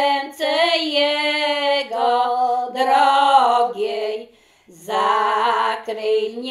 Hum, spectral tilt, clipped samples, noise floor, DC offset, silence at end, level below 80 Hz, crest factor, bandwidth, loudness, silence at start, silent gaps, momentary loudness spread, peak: none; -2 dB/octave; under 0.1%; -50 dBFS; under 0.1%; 0 s; -72 dBFS; 16 dB; 14 kHz; -18 LUFS; 0 s; none; 9 LU; -2 dBFS